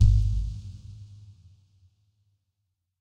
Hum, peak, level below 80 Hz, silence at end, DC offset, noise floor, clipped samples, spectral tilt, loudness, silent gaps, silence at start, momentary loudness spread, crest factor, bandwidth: none; -8 dBFS; -30 dBFS; 1.7 s; under 0.1%; -80 dBFS; under 0.1%; -7.5 dB/octave; -28 LUFS; none; 0 s; 24 LU; 20 dB; 7.4 kHz